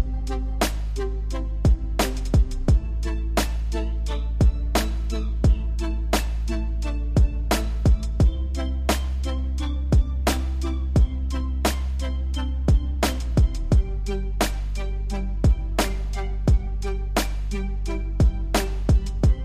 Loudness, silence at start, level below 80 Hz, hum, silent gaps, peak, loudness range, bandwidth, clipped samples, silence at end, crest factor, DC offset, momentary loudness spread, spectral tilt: -25 LUFS; 0 s; -24 dBFS; none; none; -6 dBFS; 2 LU; 15.5 kHz; under 0.1%; 0 s; 16 dB; 0.3%; 7 LU; -5.5 dB/octave